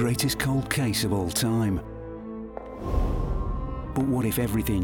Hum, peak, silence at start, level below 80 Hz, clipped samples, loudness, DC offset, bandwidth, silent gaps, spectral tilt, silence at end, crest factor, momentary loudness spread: none; -8 dBFS; 0 s; -34 dBFS; under 0.1%; -27 LUFS; under 0.1%; 18 kHz; none; -5 dB/octave; 0 s; 18 dB; 13 LU